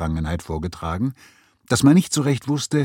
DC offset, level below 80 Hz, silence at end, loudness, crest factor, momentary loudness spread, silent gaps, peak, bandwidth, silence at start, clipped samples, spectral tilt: under 0.1%; -38 dBFS; 0 s; -21 LUFS; 18 dB; 12 LU; none; -2 dBFS; 16.5 kHz; 0 s; under 0.1%; -5.5 dB/octave